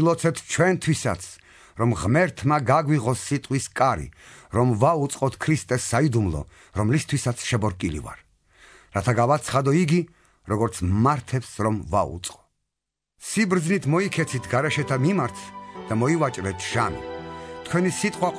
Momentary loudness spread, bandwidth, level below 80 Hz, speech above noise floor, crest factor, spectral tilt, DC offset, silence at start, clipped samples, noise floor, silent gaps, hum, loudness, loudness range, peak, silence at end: 13 LU; 11 kHz; -48 dBFS; 62 dB; 18 dB; -5.5 dB/octave; under 0.1%; 0 s; under 0.1%; -85 dBFS; none; none; -23 LUFS; 3 LU; -6 dBFS; 0 s